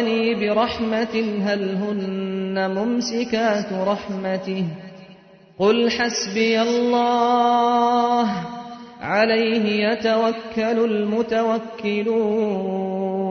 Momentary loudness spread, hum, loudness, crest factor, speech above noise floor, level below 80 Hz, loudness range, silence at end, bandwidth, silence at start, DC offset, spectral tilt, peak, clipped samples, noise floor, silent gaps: 8 LU; none; -21 LUFS; 16 dB; 27 dB; -58 dBFS; 4 LU; 0 s; 6.6 kHz; 0 s; under 0.1%; -5 dB/octave; -4 dBFS; under 0.1%; -47 dBFS; none